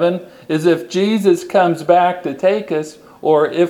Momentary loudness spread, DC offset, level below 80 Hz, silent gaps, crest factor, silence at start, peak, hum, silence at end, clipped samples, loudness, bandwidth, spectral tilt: 9 LU; under 0.1%; -64 dBFS; none; 16 dB; 0 s; 0 dBFS; none; 0 s; under 0.1%; -16 LUFS; 15 kHz; -6 dB/octave